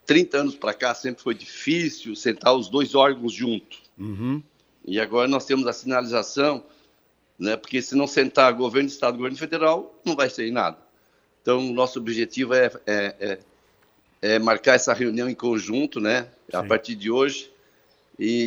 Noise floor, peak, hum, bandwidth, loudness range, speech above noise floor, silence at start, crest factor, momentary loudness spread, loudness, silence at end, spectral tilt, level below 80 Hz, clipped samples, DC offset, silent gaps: -64 dBFS; 0 dBFS; none; over 20 kHz; 3 LU; 41 dB; 0.05 s; 22 dB; 11 LU; -23 LUFS; 0 s; -4 dB/octave; -68 dBFS; under 0.1%; under 0.1%; none